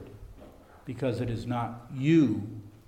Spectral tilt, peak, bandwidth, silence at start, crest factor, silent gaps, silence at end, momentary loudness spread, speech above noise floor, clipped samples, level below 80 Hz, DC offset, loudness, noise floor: -8 dB/octave; -12 dBFS; 9.8 kHz; 0 s; 18 dB; none; 0.1 s; 23 LU; 23 dB; under 0.1%; -54 dBFS; under 0.1%; -28 LUFS; -51 dBFS